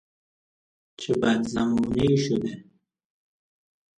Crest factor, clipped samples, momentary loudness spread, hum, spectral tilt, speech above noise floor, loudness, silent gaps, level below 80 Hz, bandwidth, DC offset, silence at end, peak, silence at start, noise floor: 18 dB; under 0.1%; 13 LU; none; -6 dB/octave; over 67 dB; -24 LUFS; none; -52 dBFS; 10.5 kHz; under 0.1%; 1.35 s; -8 dBFS; 1 s; under -90 dBFS